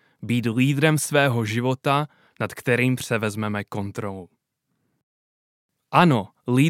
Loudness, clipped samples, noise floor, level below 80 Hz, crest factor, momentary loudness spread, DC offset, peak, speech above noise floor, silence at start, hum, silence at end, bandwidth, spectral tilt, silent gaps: -22 LUFS; under 0.1%; -75 dBFS; -66 dBFS; 22 dB; 12 LU; under 0.1%; -2 dBFS; 54 dB; 0.2 s; none; 0 s; 16.5 kHz; -5.5 dB/octave; 5.03-5.69 s